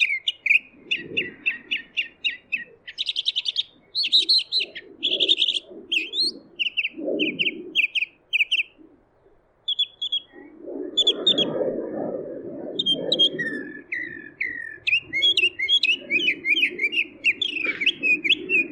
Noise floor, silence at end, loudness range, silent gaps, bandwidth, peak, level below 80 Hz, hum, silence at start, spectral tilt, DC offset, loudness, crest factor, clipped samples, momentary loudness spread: -59 dBFS; 0 s; 5 LU; none; 16 kHz; -8 dBFS; -68 dBFS; none; 0 s; -2 dB/octave; under 0.1%; -22 LUFS; 18 dB; under 0.1%; 12 LU